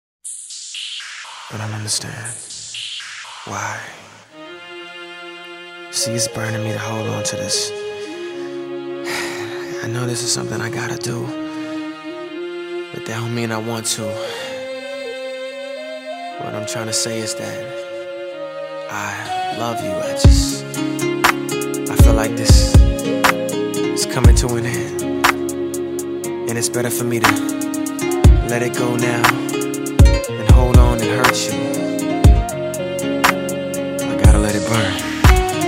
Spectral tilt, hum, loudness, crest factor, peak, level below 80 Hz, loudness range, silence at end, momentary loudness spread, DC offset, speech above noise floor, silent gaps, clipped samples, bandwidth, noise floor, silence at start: -4.5 dB/octave; none; -19 LUFS; 18 dB; 0 dBFS; -22 dBFS; 11 LU; 0 s; 15 LU; under 0.1%; 20 dB; none; under 0.1%; 16.5 kHz; -38 dBFS; 0.25 s